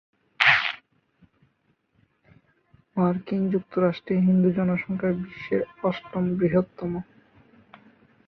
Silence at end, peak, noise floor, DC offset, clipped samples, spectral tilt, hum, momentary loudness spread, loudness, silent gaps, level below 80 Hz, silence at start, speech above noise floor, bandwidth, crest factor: 1.25 s; 0 dBFS; -69 dBFS; under 0.1%; under 0.1%; -7.5 dB/octave; none; 12 LU; -24 LUFS; none; -60 dBFS; 0.4 s; 45 dB; 6.6 kHz; 26 dB